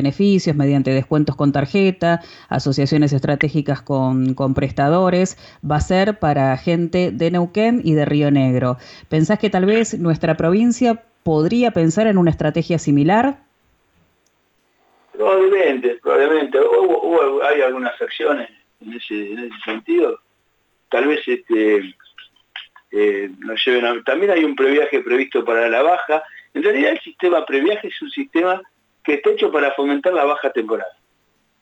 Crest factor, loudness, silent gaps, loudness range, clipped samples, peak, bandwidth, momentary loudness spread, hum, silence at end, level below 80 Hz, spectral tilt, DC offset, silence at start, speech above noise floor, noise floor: 12 dB; -17 LUFS; none; 4 LU; under 0.1%; -4 dBFS; 8.2 kHz; 10 LU; none; 0.7 s; -46 dBFS; -6.5 dB/octave; under 0.1%; 0 s; 47 dB; -64 dBFS